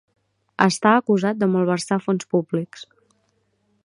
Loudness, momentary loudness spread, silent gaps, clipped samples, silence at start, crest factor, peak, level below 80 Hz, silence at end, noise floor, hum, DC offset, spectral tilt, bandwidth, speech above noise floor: -20 LUFS; 15 LU; none; under 0.1%; 0.6 s; 22 dB; 0 dBFS; -68 dBFS; 1 s; -67 dBFS; none; under 0.1%; -5.5 dB/octave; 11 kHz; 48 dB